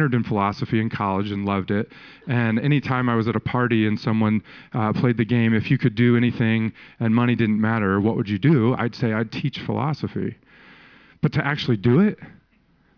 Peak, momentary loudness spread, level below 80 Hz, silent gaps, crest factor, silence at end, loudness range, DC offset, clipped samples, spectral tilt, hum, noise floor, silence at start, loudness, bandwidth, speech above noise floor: -6 dBFS; 8 LU; -56 dBFS; none; 14 dB; 0.7 s; 4 LU; under 0.1%; under 0.1%; -9 dB/octave; none; -60 dBFS; 0 s; -22 LUFS; 5.4 kHz; 39 dB